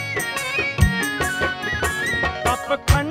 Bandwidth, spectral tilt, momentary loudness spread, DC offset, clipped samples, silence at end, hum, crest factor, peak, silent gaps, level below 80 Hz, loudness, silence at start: 16 kHz; -4 dB/octave; 3 LU; under 0.1%; under 0.1%; 0 s; none; 18 dB; -2 dBFS; none; -30 dBFS; -21 LUFS; 0 s